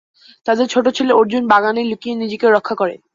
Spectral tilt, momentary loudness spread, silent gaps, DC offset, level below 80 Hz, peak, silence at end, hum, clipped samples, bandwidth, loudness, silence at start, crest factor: -4.5 dB/octave; 8 LU; none; under 0.1%; -62 dBFS; -2 dBFS; 0.2 s; none; under 0.1%; 7.6 kHz; -16 LUFS; 0.45 s; 14 dB